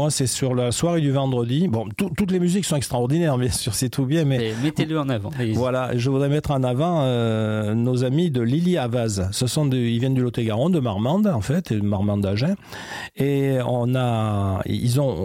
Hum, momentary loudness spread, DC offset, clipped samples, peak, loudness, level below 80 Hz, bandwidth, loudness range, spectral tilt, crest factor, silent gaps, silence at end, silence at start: none; 3 LU; under 0.1%; under 0.1%; -10 dBFS; -22 LUFS; -48 dBFS; 16 kHz; 1 LU; -6 dB/octave; 10 dB; none; 0 s; 0 s